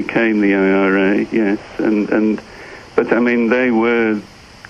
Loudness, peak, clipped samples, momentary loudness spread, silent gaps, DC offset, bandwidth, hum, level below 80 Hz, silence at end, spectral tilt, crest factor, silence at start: -16 LUFS; 0 dBFS; under 0.1%; 8 LU; none; under 0.1%; 7.4 kHz; none; -50 dBFS; 0.45 s; -7.5 dB/octave; 16 dB; 0 s